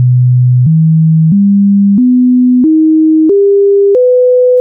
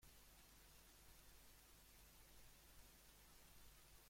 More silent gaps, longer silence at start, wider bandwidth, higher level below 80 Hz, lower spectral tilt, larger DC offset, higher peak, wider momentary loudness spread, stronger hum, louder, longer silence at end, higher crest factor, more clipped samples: neither; about the same, 0 s vs 0 s; second, 0.9 kHz vs 16.5 kHz; first, -52 dBFS vs -72 dBFS; first, -16 dB/octave vs -2.5 dB/octave; neither; first, -4 dBFS vs -48 dBFS; about the same, 1 LU vs 0 LU; neither; first, -7 LUFS vs -67 LUFS; about the same, 0 s vs 0 s; second, 4 dB vs 18 dB; neither